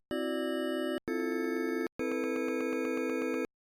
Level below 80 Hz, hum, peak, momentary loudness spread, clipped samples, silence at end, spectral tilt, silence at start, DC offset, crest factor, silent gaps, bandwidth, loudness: -70 dBFS; none; -22 dBFS; 2 LU; under 0.1%; 0.15 s; -4 dB/octave; 0.1 s; under 0.1%; 10 dB; 1.92-1.99 s; 17.5 kHz; -33 LUFS